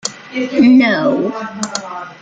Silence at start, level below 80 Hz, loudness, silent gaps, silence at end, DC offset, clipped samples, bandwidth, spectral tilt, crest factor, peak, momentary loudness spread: 0.05 s; -56 dBFS; -14 LUFS; none; 0.1 s; under 0.1%; under 0.1%; 9.2 kHz; -4 dB/octave; 12 dB; -2 dBFS; 14 LU